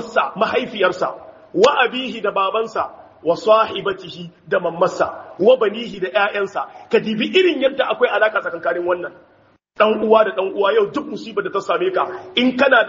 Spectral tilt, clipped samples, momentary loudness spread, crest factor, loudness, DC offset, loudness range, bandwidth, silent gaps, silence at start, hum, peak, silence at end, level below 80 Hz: -2 dB/octave; under 0.1%; 11 LU; 18 dB; -18 LUFS; under 0.1%; 2 LU; 7.4 kHz; none; 0 s; none; 0 dBFS; 0 s; -62 dBFS